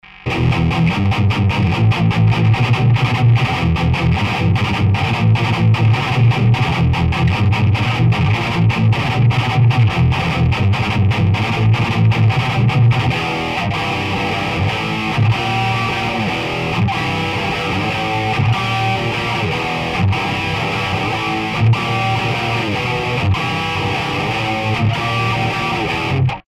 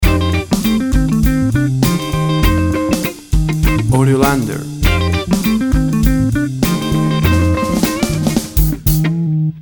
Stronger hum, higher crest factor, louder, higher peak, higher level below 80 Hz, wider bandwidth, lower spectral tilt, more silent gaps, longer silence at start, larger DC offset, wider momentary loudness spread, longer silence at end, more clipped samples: neither; about the same, 12 dB vs 14 dB; about the same, -16 LUFS vs -15 LUFS; second, -4 dBFS vs 0 dBFS; second, -34 dBFS vs -20 dBFS; second, 10.5 kHz vs over 20 kHz; about the same, -6.5 dB/octave vs -6 dB/octave; neither; first, 0.15 s vs 0 s; neither; about the same, 5 LU vs 4 LU; about the same, 0.1 s vs 0 s; neither